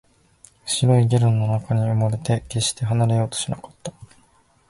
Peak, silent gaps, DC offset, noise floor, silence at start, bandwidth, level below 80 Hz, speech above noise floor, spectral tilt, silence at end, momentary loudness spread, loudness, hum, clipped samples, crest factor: -6 dBFS; none; under 0.1%; -58 dBFS; 0.65 s; 11.5 kHz; -50 dBFS; 38 dB; -5.5 dB/octave; 0.65 s; 17 LU; -21 LUFS; none; under 0.1%; 16 dB